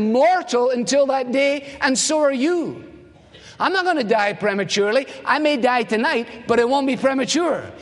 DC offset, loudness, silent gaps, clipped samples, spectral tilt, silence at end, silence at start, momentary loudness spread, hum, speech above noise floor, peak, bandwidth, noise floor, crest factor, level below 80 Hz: under 0.1%; -19 LUFS; none; under 0.1%; -3 dB/octave; 0 s; 0 s; 5 LU; none; 26 dB; -2 dBFS; 11.5 kHz; -45 dBFS; 18 dB; -60 dBFS